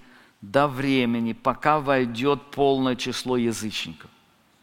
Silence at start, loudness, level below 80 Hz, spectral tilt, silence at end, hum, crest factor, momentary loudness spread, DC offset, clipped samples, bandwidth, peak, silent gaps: 0.4 s; -24 LUFS; -52 dBFS; -5 dB/octave; 0.55 s; none; 22 dB; 6 LU; under 0.1%; under 0.1%; 16.5 kHz; -4 dBFS; none